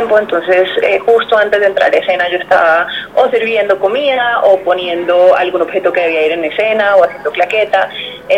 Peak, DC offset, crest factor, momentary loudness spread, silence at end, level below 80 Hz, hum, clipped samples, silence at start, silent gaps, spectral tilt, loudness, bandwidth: 0 dBFS; 0.1%; 12 dB; 5 LU; 0 s; -52 dBFS; none; under 0.1%; 0 s; none; -4.5 dB/octave; -11 LUFS; 9.2 kHz